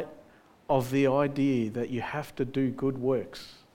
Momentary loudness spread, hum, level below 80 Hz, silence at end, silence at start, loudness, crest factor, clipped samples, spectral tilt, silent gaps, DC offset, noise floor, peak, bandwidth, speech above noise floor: 10 LU; none; -58 dBFS; 0.2 s; 0 s; -29 LUFS; 16 dB; under 0.1%; -7 dB/octave; none; under 0.1%; -57 dBFS; -12 dBFS; 17 kHz; 29 dB